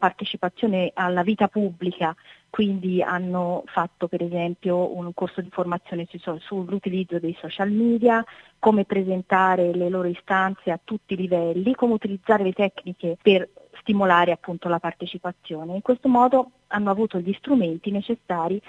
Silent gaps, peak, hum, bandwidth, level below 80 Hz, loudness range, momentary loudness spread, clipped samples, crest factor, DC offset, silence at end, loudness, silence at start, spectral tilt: none; -2 dBFS; none; 7.6 kHz; -64 dBFS; 5 LU; 11 LU; under 0.1%; 20 dB; under 0.1%; 0.1 s; -23 LUFS; 0 s; -8 dB/octave